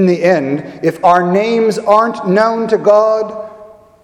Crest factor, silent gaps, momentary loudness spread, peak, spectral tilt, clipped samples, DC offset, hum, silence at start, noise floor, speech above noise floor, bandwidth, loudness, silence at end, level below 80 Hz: 12 dB; none; 9 LU; 0 dBFS; -6.5 dB/octave; 0.1%; under 0.1%; none; 0 s; -38 dBFS; 26 dB; 12.5 kHz; -12 LUFS; 0.4 s; -58 dBFS